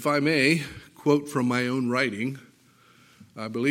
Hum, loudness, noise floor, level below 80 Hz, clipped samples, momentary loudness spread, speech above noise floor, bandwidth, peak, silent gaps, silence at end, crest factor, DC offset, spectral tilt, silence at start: none; -25 LUFS; -58 dBFS; -66 dBFS; under 0.1%; 15 LU; 33 dB; 16.5 kHz; -8 dBFS; none; 0 s; 18 dB; under 0.1%; -5.5 dB/octave; 0 s